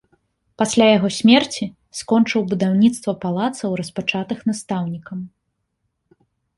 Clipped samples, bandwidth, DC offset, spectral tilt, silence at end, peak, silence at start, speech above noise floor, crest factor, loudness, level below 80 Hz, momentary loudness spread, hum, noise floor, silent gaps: under 0.1%; 11.5 kHz; under 0.1%; -5 dB/octave; 1.3 s; -2 dBFS; 0.6 s; 55 dB; 18 dB; -19 LUFS; -58 dBFS; 15 LU; none; -73 dBFS; none